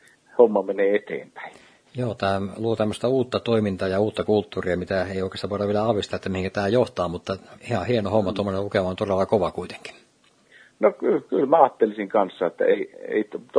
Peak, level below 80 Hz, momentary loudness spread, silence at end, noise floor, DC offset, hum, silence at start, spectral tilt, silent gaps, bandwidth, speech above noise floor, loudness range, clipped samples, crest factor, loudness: -2 dBFS; -58 dBFS; 12 LU; 0 s; -60 dBFS; under 0.1%; none; 0.35 s; -7 dB/octave; none; 10.5 kHz; 37 dB; 3 LU; under 0.1%; 22 dB; -23 LUFS